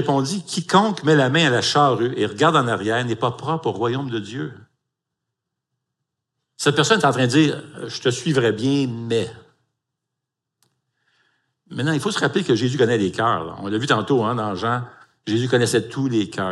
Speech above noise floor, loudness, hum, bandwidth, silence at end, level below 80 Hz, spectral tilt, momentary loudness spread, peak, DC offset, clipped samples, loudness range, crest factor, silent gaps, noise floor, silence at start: 63 dB; -20 LUFS; none; 12.5 kHz; 0 s; -68 dBFS; -5 dB/octave; 10 LU; -2 dBFS; under 0.1%; under 0.1%; 9 LU; 20 dB; none; -82 dBFS; 0 s